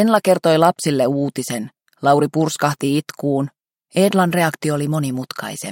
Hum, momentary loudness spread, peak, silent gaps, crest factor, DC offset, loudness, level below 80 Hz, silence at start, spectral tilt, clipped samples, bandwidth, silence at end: none; 11 LU; -2 dBFS; none; 16 dB; under 0.1%; -18 LUFS; -62 dBFS; 0 s; -5.5 dB/octave; under 0.1%; 17 kHz; 0 s